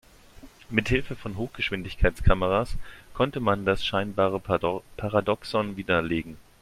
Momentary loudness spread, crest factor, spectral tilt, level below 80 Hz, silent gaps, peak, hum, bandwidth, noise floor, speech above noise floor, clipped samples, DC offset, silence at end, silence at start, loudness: 9 LU; 22 dB; -6.5 dB/octave; -36 dBFS; none; -4 dBFS; none; 14.5 kHz; -49 dBFS; 23 dB; under 0.1%; under 0.1%; 0.2 s; 0.4 s; -27 LUFS